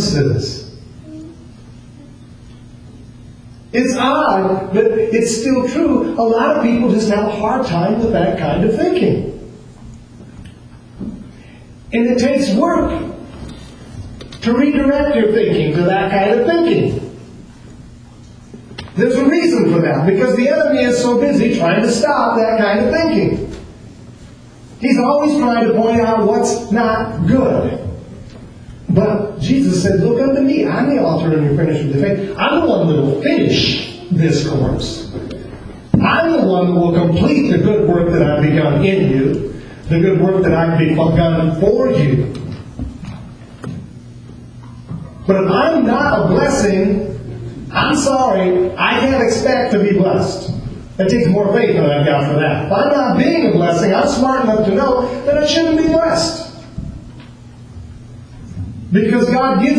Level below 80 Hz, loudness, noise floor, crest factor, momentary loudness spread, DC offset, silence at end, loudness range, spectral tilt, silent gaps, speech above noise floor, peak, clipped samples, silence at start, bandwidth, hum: -38 dBFS; -14 LUFS; -38 dBFS; 14 dB; 17 LU; under 0.1%; 0 s; 6 LU; -6.5 dB/octave; none; 25 dB; 0 dBFS; under 0.1%; 0 s; 10.5 kHz; none